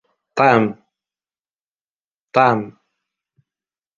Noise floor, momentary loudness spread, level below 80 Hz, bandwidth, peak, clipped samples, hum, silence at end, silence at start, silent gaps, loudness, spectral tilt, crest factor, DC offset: under -90 dBFS; 13 LU; -64 dBFS; 7.4 kHz; -2 dBFS; under 0.1%; none; 1.3 s; 0.35 s; 1.53-1.57 s, 1.66-1.97 s, 2.04-2.28 s; -17 LUFS; -7 dB/octave; 20 dB; under 0.1%